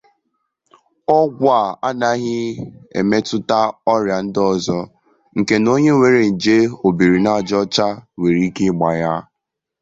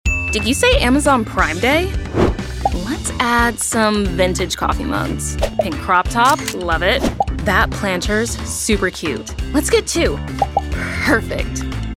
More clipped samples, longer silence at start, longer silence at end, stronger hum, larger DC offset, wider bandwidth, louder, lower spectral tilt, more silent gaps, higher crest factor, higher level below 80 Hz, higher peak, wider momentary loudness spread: neither; first, 1.1 s vs 0.05 s; first, 0.6 s vs 0.05 s; neither; neither; second, 7.8 kHz vs 16.5 kHz; about the same, -17 LUFS vs -17 LUFS; first, -6 dB/octave vs -4 dB/octave; neither; about the same, 16 dB vs 16 dB; second, -52 dBFS vs -26 dBFS; about the same, -2 dBFS vs 0 dBFS; first, 10 LU vs 7 LU